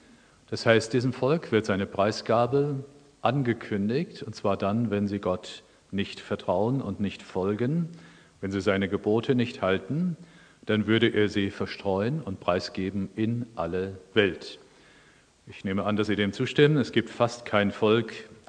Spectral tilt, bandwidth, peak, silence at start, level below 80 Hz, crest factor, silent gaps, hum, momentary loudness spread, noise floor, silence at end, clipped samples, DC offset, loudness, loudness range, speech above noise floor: -6.5 dB/octave; 10 kHz; -4 dBFS; 0.5 s; -64 dBFS; 22 dB; none; none; 10 LU; -58 dBFS; 0.15 s; under 0.1%; under 0.1%; -27 LUFS; 4 LU; 32 dB